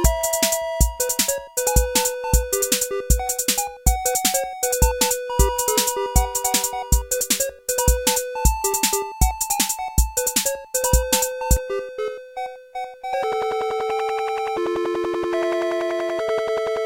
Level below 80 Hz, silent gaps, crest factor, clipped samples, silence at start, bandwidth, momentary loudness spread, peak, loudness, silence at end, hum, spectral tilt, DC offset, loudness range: -26 dBFS; none; 20 dB; under 0.1%; 0 s; 17 kHz; 5 LU; -2 dBFS; -21 LUFS; 0 s; none; -3 dB/octave; under 0.1%; 4 LU